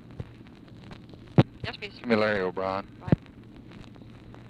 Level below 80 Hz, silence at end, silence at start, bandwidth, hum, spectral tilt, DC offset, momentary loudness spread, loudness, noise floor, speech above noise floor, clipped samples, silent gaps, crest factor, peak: -52 dBFS; 0 s; 0.1 s; 9 kHz; none; -8.5 dB/octave; under 0.1%; 23 LU; -28 LUFS; -48 dBFS; 20 dB; under 0.1%; none; 24 dB; -6 dBFS